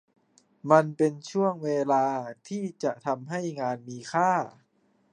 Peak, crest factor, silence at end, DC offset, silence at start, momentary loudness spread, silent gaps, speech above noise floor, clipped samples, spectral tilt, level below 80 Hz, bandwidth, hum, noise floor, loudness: -4 dBFS; 24 dB; 0.65 s; under 0.1%; 0.65 s; 13 LU; none; 41 dB; under 0.1%; -6.5 dB/octave; -78 dBFS; 10 kHz; none; -68 dBFS; -27 LUFS